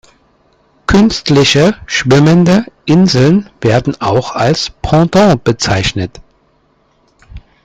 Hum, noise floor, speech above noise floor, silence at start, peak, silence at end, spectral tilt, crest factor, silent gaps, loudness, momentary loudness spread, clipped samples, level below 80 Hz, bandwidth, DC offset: none; -54 dBFS; 44 dB; 0.9 s; 0 dBFS; 0.25 s; -5.5 dB/octave; 12 dB; none; -10 LUFS; 7 LU; under 0.1%; -34 dBFS; 9.4 kHz; under 0.1%